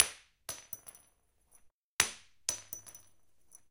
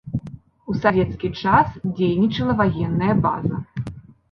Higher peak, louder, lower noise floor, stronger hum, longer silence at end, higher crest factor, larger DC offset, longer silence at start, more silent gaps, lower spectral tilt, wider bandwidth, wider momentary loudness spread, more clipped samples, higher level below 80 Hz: about the same, 0 dBFS vs -2 dBFS; second, -36 LUFS vs -21 LUFS; first, -72 dBFS vs -40 dBFS; neither; first, 0.75 s vs 0.3 s; first, 40 dB vs 18 dB; neither; about the same, 0 s vs 0.05 s; first, 1.72-1.99 s vs none; second, 1 dB/octave vs -9 dB/octave; first, 17 kHz vs 6.4 kHz; first, 20 LU vs 14 LU; neither; second, -70 dBFS vs -42 dBFS